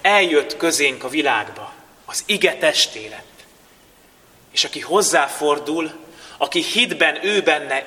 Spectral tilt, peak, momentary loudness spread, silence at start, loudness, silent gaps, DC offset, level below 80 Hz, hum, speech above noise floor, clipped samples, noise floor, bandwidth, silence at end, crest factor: -1.5 dB/octave; 0 dBFS; 16 LU; 0.05 s; -18 LUFS; none; under 0.1%; -64 dBFS; none; 32 dB; under 0.1%; -51 dBFS; 19 kHz; 0 s; 20 dB